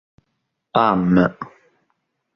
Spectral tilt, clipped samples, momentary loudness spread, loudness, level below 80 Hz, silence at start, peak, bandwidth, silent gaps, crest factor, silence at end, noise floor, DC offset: -9 dB/octave; under 0.1%; 21 LU; -18 LUFS; -50 dBFS; 0.75 s; -2 dBFS; 6 kHz; none; 20 dB; 0.9 s; -74 dBFS; under 0.1%